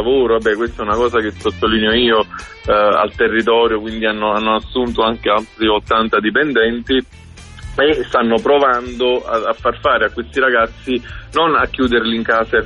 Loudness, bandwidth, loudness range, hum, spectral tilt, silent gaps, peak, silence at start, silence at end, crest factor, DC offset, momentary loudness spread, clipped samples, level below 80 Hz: -15 LUFS; 11 kHz; 1 LU; none; -5.5 dB/octave; none; -2 dBFS; 0 s; 0 s; 12 dB; under 0.1%; 6 LU; under 0.1%; -36 dBFS